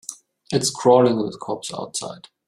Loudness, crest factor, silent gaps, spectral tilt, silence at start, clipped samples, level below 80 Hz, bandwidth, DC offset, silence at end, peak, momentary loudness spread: -21 LUFS; 20 dB; none; -4.5 dB/octave; 0.1 s; under 0.1%; -62 dBFS; 14 kHz; under 0.1%; 0.3 s; -2 dBFS; 15 LU